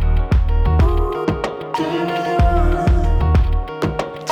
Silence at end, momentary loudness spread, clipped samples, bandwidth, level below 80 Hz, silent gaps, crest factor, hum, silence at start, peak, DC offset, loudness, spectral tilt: 0 s; 6 LU; under 0.1%; 8.8 kHz; -18 dBFS; none; 12 dB; none; 0 s; -4 dBFS; under 0.1%; -18 LUFS; -7.5 dB/octave